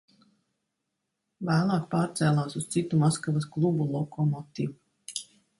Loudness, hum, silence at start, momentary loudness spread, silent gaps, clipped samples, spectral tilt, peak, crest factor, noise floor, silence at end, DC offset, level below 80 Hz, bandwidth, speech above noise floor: -28 LUFS; none; 1.4 s; 12 LU; none; under 0.1%; -6.5 dB/octave; -12 dBFS; 16 dB; -82 dBFS; 0.35 s; under 0.1%; -66 dBFS; 11.5 kHz; 56 dB